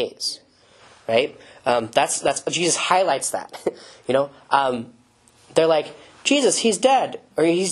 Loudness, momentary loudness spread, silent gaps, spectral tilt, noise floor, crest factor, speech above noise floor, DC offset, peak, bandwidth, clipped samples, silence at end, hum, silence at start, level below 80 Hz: -21 LUFS; 12 LU; none; -2.5 dB/octave; -55 dBFS; 22 dB; 35 dB; under 0.1%; 0 dBFS; 13 kHz; under 0.1%; 0 s; none; 0 s; -64 dBFS